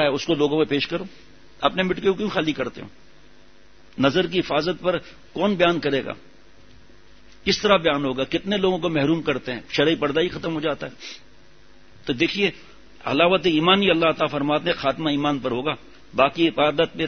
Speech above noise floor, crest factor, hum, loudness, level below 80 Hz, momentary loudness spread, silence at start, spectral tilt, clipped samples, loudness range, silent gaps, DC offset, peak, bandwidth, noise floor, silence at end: 32 dB; 22 dB; none; -22 LUFS; -52 dBFS; 13 LU; 0 s; -5.5 dB/octave; under 0.1%; 5 LU; none; 0.5%; -2 dBFS; 6.6 kHz; -53 dBFS; 0 s